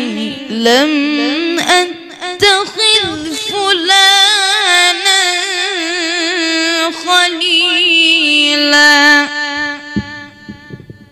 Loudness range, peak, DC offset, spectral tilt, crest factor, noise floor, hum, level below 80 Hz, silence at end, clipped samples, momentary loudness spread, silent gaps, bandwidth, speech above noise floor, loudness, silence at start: 3 LU; 0 dBFS; under 0.1%; -1 dB/octave; 12 dB; -33 dBFS; none; -48 dBFS; 0.2 s; 0.2%; 13 LU; none; 16 kHz; 22 dB; -10 LUFS; 0 s